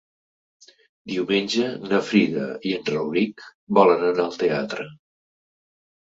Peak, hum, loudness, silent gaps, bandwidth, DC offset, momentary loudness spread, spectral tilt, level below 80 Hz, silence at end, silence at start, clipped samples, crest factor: -2 dBFS; none; -22 LUFS; 3.54-3.67 s; 7.8 kHz; under 0.1%; 11 LU; -5.5 dB/octave; -66 dBFS; 1.15 s; 1.05 s; under 0.1%; 22 dB